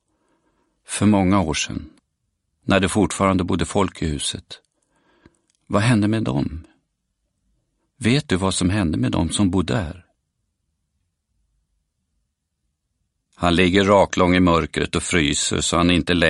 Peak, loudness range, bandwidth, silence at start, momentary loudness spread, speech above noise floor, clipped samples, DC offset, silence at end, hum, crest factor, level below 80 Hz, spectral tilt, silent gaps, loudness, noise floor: 0 dBFS; 7 LU; 11.5 kHz; 0.9 s; 9 LU; 56 dB; under 0.1%; under 0.1%; 0 s; none; 20 dB; -42 dBFS; -5 dB/octave; none; -19 LUFS; -75 dBFS